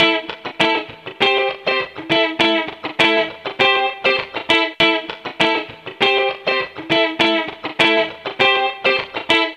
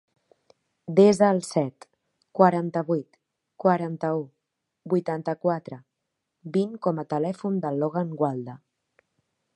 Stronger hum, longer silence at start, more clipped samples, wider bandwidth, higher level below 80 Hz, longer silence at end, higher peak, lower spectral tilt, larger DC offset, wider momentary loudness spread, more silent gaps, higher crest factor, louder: neither; second, 0 s vs 0.9 s; neither; about the same, 12.5 kHz vs 11.5 kHz; first, -58 dBFS vs -74 dBFS; second, 0 s vs 1 s; about the same, -2 dBFS vs -4 dBFS; second, -3.5 dB/octave vs -7 dB/octave; neither; second, 8 LU vs 16 LU; neither; second, 16 dB vs 24 dB; first, -17 LUFS vs -25 LUFS